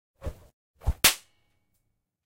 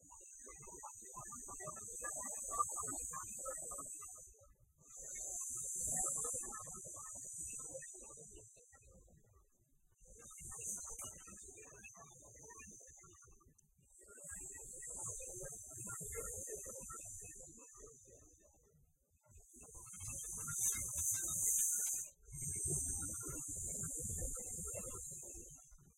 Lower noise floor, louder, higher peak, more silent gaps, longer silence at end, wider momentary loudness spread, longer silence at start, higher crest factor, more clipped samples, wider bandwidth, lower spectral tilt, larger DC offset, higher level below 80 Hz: about the same, -77 dBFS vs -74 dBFS; first, -24 LUFS vs -42 LUFS; first, -4 dBFS vs -24 dBFS; first, 0.53-0.74 s vs none; first, 1.1 s vs 0.05 s; about the same, 21 LU vs 20 LU; first, 0.25 s vs 0 s; first, 28 dB vs 22 dB; neither; about the same, 16 kHz vs 16 kHz; second, -1 dB/octave vs -2.5 dB/octave; neither; first, -38 dBFS vs -62 dBFS